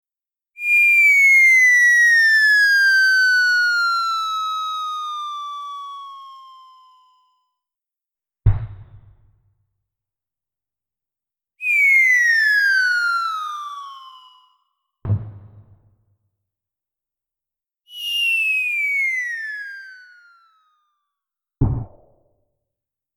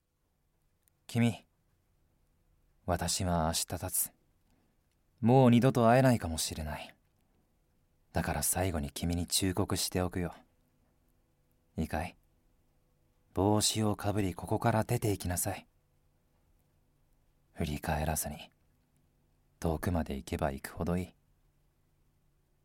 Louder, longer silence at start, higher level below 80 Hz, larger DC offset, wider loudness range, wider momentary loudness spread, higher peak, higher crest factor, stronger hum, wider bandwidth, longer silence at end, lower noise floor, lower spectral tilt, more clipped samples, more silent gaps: first, -15 LUFS vs -31 LUFS; second, 0.6 s vs 1.1 s; first, -40 dBFS vs -50 dBFS; neither; first, 21 LU vs 10 LU; first, 20 LU vs 15 LU; first, -4 dBFS vs -12 dBFS; about the same, 18 dB vs 22 dB; neither; first, 19.5 kHz vs 17 kHz; second, 1.3 s vs 1.55 s; first, under -90 dBFS vs -77 dBFS; second, -2 dB/octave vs -5 dB/octave; neither; neither